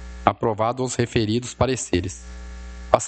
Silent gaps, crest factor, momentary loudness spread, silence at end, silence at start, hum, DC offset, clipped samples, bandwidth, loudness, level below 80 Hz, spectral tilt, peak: none; 24 dB; 17 LU; 0 s; 0 s; none; under 0.1%; under 0.1%; 9 kHz; -23 LUFS; -40 dBFS; -5 dB/octave; 0 dBFS